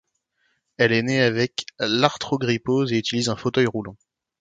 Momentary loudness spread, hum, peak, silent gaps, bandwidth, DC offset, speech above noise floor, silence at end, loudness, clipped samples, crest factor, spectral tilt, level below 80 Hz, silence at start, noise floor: 6 LU; none; 0 dBFS; none; 9.4 kHz; under 0.1%; 48 dB; 0.45 s; -22 LUFS; under 0.1%; 22 dB; -5 dB/octave; -60 dBFS; 0.8 s; -70 dBFS